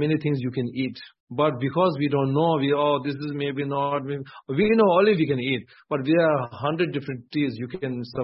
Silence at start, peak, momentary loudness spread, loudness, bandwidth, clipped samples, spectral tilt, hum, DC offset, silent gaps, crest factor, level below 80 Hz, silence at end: 0 s; -8 dBFS; 11 LU; -24 LUFS; 5.8 kHz; under 0.1%; -11 dB/octave; none; under 0.1%; 1.20-1.27 s; 16 dB; -62 dBFS; 0 s